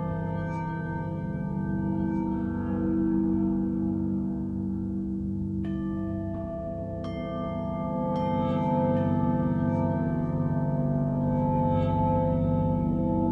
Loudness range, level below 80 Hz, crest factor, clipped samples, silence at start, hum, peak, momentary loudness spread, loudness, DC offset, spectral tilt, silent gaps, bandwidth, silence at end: 5 LU; -42 dBFS; 14 dB; under 0.1%; 0 s; none; -14 dBFS; 7 LU; -28 LUFS; under 0.1%; -11 dB/octave; none; 5.8 kHz; 0 s